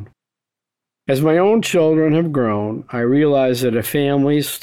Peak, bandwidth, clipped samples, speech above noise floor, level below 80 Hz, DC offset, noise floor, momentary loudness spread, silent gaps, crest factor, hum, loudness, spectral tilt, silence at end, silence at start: -4 dBFS; 20 kHz; under 0.1%; 70 dB; -56 dBFS; under 0.1%; -86 dBFS; 7 LU; none; 12 dB; none; -16 LUFS; -6 dB/octave; 0.05 s; 0 s